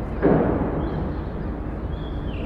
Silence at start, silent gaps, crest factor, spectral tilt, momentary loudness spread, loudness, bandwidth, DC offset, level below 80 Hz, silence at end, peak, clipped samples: 0 s; none; 18 dB; -10.5 dB/octave; 11 LU; -25 LUFS; 5.2 kHz; under 0.1%; -32 dBFS; 0 s; -6 dBFS; under 0.1%